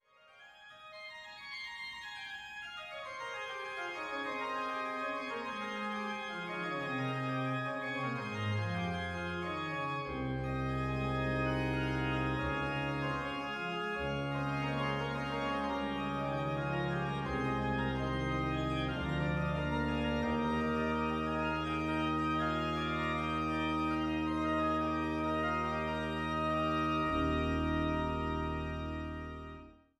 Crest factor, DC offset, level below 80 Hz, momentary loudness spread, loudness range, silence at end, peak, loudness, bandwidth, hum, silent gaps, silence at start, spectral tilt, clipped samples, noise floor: 14 dB; under 0.1%; -48 dBFS; 9 LU; 5 LU; 0.25 s; -22 dBFS; -35 LUFS; 13 kHz; none; none; 0.35 s; -6.5 dB/octave; under 0.1%; -60 dBFS